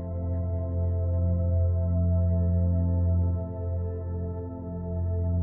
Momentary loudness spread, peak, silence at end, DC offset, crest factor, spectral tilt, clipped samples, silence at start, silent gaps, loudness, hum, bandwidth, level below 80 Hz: 8 LU; -16 dBFS; 0 s; under 0.1%; 10 dB; -15 dB/octave; under 0.1%; 0 s; none; -28 LUFS; none; 1.9 kHz; -36 dBFS